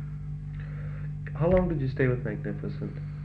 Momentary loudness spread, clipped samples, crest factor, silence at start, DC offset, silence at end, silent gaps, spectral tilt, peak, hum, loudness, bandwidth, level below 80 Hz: 12 LU; under 0.1%; 18 dB; 0 s; under 0.1%; 0 s; none; -10.5 dB/octave; -10 dBFS; 50 Hz at -40 dBFS; -30 LUFS; 4.9 kHz; -42 dBFS